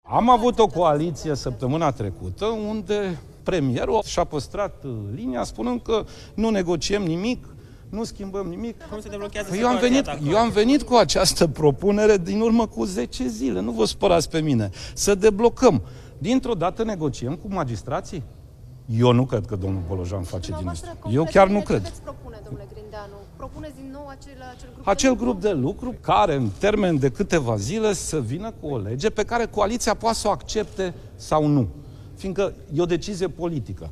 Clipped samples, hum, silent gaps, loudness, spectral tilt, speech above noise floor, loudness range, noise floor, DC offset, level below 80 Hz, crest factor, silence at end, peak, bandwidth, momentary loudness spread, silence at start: under 0.1%; none; none; -23 LUFS; -5.5 dB/octave; 21 dB; 6 LU; -43 dBFS; under 0.1%; -40 dBFS; 20 dB; 0 s; -2 dBFS; 14.5 kHz; 18 LU; 0.05 s